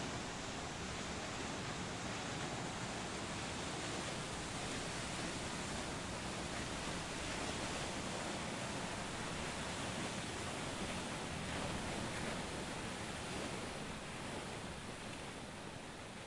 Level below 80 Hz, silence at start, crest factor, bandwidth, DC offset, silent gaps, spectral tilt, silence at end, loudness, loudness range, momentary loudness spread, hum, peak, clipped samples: -58 dBFS; 0 s; 14 dB; 11.5 kHz; under 0.1%; none; -3.5 dB/octave; 0 s; -43 LUFS; 2 LU; 4 LU; none; -28 dBFS; under 0.1%